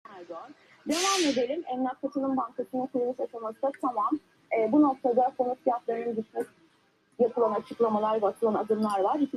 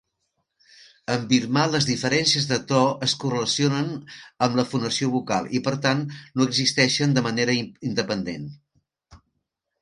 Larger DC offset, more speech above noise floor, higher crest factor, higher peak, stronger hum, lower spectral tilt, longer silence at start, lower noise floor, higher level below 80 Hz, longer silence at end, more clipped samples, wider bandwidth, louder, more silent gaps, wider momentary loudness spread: neither; second, 39 dB vs 55 dB; about the same, 16 dB vs 20 dB; second, -12 dBFS vs -4 dBFS; neither; about the same, -4 dB/octave vs -4 dB/octave; second, 0.1 s vs 1.1 s; second, -67 dBFS vs -79 dBFS; second, -76 dBFS vs -60 dBFS; second, 0 s vs 0.65 s; neither; first, 13.5 kHz vs 11 kHz; second, -28 LUFS vs -23 LUFS; neither; about the same, 11 LU vs 10 LU